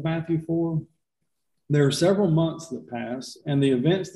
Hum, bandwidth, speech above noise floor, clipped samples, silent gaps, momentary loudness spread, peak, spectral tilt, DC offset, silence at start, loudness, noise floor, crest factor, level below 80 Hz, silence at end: none; 12.5 kHz; 57 dB; under 0.1%; none; 13 LU; -8 dBFS; -6.5 dB/octave; under 0.1%; 0 s; -24 LUFS; -81 dBFS; 16 dB; -60 dBFS; 0.05 s